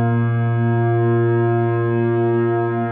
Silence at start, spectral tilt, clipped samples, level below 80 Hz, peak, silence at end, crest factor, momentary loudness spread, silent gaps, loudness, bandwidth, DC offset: 0 s; -14 dB/octave; under 0.1%; -66 dBFS; -8 dBFS; 0 s; 8 dB; 2 LU; none; -18 LUFS; 3.6 kHz; under 0.1%